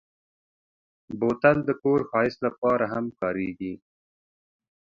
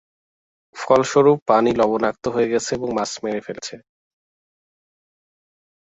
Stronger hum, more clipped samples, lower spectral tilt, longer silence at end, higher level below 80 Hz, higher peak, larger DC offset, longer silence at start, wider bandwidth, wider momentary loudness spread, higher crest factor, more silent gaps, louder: neither; neither; first, -8.5 dB/octave vs -5 dB/octave; second, 1.1 s vs 2.05 s; about the same, -60 dBFS vs -56 dBFS; second, -6 dBFS vs -2 dBFS; neither; first, 1.1 s vs 0.75 s; second, 7.2 kHz vs 8.2 kHz; about the same, 14 LU vs 16 LU; about the same, 22 dB vs 20 dB; about the same, 2.58-2.62 s vs 1.42-1.46 s; second, -25 LUFS vs -19 LUFS